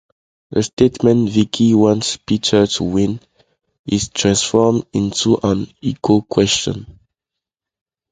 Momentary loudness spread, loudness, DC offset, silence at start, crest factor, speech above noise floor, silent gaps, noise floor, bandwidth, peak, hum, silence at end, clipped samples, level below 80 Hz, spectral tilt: 8 LU; -16 LUFS; under 0.1%; 0.5 s; 16 dB; 68 dB; 0.73-0.77 s, 3.79-3.84 s; -84 dBFS; 9.6 kHz; 0 dBFS; none; 1.2 s; under 0.1%; -44 dBFS; -5 dB/octave